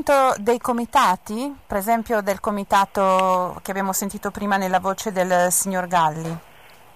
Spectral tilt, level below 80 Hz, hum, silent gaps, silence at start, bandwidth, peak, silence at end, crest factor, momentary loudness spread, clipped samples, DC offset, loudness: -4 dB/octave; -52 dBFS; none; none; 0 s; 15.5 kHz; -6 dBFS; 0.55 s; 14 dB; 9 LU; under 0.1%; 0.3%; -21 LUFS